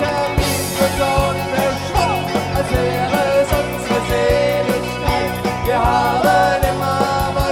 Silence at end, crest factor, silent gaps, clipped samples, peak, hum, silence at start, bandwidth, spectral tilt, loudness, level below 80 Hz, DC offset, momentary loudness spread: 0 s; 14 dB; none; under 0.1%; -2 dBFS; none; 0 s; 19 kHz; -5 dB/octave; -17 LUFS; -30 dBFS; under 0.1%; 5 LU